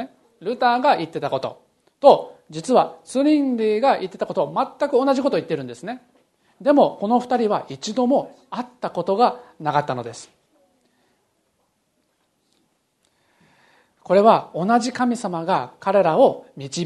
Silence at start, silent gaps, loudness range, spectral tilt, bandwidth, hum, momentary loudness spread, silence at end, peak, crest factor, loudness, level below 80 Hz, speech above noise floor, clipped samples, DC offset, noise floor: 0 s; none; 6 LU; -5.5 dB/octave; 11.5 kHz; none; 16 LU; 0 s; 0 dBFS; 22 dB; -20 LUFS; -70 dBFS; 49 dB; under 0.1%; under 0.1%; -69 dBFS